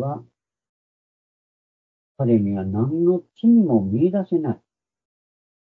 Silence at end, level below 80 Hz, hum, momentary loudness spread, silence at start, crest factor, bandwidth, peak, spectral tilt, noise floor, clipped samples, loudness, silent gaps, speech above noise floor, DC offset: 1.2 s; -68 dBFS; none; 12 LU; 0 s; 16 dB; 3.5 kHz; -6 dBFS; -12.5 dB/octave; under -90 dBFS; under 0.1%; -20 LUFS; 0.69-2.15 s; over 71 dB; under 0.1%